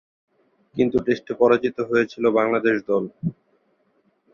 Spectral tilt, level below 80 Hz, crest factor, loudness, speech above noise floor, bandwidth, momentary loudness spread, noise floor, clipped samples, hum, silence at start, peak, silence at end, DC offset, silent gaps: -7.5 dB/octave; -58 dBFS; 18 dB; -21 LUFS; 45 dB; 7 kHz; 11 LU; -65 dBFS; under 0.1%; none; 0.75 s; -4 dBFS; 1 s; under 0.1%; none